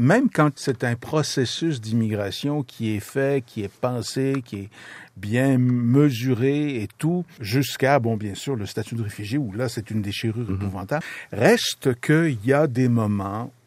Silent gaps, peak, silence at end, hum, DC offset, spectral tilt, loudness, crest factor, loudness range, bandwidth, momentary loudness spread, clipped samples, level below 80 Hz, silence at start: none; -2 dBFS; 0.2 s; none; under 0.1%; -6 dB/octave; -23 LUFS; 20 dB; 4 LU; 15.5 kHz; 10 LU; under 0.1%; -66 dBFS; 0 s